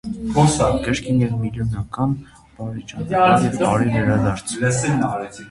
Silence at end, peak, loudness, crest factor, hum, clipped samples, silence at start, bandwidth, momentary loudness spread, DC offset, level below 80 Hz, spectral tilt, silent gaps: 0 s; -2 dBFS; -19 LUFS; 18 dB; none; under 0.1%; 0.05 s; 11.5 kHz; 14 LU; under 0.1%; -40 dBFS; -6 dB/octave; none